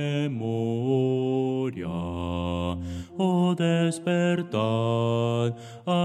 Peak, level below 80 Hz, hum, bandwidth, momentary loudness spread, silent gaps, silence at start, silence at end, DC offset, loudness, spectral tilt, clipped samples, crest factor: -12 dBFS; -52 dBFS; none; 11 kHz; 8 LU; none; 0 s; 0 s; under 0.1%; -26 LUFS; -7 dB/octave; under 0.1%; 14 dB